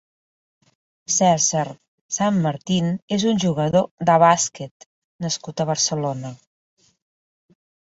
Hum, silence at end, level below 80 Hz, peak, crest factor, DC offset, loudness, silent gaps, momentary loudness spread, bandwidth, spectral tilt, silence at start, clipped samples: none; 1.5 s; -60 dBFS; -4 dBFS; 20 dB; under 0.1%; -20 LUFS; 1.88-2.09 s, 3.02-3.08 s, 3.91-3.98 s, 4.71-4.80 s, 4.86-5.19 s; 15 LU; 8 kHz; -4 dB/octave; 1.1 s; under 0.1%